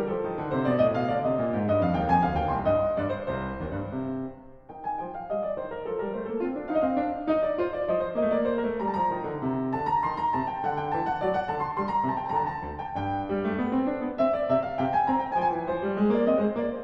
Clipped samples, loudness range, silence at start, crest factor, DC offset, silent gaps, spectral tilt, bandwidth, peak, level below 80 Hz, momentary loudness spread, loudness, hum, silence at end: under 0.1%; 5 LU; 0 s; 18 dB; under 0.1%; none; -9 dB/octave; 6.2 kHz; -10 dBFS; -50 dBFS; 9 LU; -27 LUFS; none; 0 s